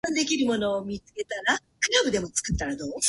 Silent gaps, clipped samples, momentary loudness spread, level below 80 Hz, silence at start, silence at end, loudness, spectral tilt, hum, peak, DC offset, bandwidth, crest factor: none; under 0.1%; 10 LU; -44 dBFS; 0.05 s; 0 s; -26 LUFS; -2.5 dB/octave; none; -8 dBFS; under 0.1%; 12 kHz; 18 dB